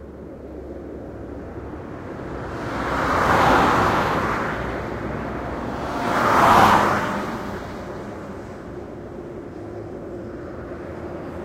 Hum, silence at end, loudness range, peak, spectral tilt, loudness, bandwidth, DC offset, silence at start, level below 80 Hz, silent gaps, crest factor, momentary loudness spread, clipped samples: none; 0 s; 14 LU; -2 dBFS; -5.5 dB/octave; -21 LUFS; 16.5 kHz; under 0.1%; 0 s; -40 dBFS; none; 22 dB; 19 LU; under 0.1%